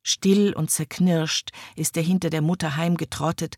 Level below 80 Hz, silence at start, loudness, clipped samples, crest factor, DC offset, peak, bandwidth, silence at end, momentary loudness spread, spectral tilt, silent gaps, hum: -56 dBFS; 0.05 s; -23 LUFS; under 0.1%; 14 dB; under 0.1%; -8 dBFS; 16.5 kHz; 0 s; 7 LU; -4.5 dB/octave; none; none